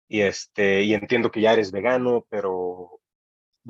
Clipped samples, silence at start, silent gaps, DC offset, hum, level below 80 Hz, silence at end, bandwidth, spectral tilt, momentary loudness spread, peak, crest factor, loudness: under 0.1%; 0.1 s; 3.15-3.52 s; under 0.1%; none; -66 dBFS; 0 s; 7.8 kHz; -5 dB/octave; 8 LU; -6 dBFS; 16 dB; -22 LUFS